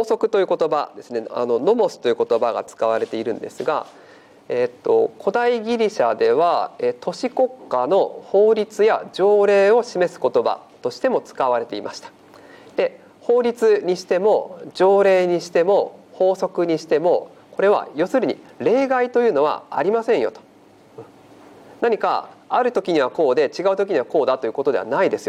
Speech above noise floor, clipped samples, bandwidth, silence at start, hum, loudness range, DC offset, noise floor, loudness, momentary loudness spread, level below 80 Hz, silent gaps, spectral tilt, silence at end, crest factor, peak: 31 dB; under 0.1%; 11 kHz; 0 s; none; 5 LU; under 0.1%; -49 dBFS; -20 LUFS; 9 LU; -72 dBFS; none; -5.5 dB/octave; 0 s; 14 dB; -6 dBFS